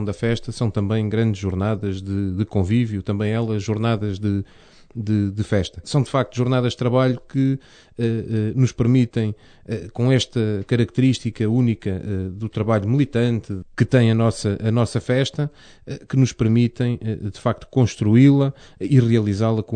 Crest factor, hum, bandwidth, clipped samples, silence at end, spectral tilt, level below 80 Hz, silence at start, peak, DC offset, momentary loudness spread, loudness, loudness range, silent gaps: 16 dB; none; 9.4 kHz; under 0.1%; 0 s; -7.5 dB/octave; -48 dBFS; 0 s; -4 dBFS; under 0.1%; 10 LU; -21 LUFS; 3 LU; none